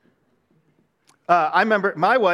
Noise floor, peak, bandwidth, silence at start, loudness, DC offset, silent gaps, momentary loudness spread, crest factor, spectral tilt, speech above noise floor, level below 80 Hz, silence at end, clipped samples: -64 dBFS; -2 dBFS; 12 kHz; 1.3 s; -19 LUFS; under 0.1%; none; 3 LU; 18 dB; -6 dB/octave; 46 dB; -76 dBFS; 0 s; under 0.1%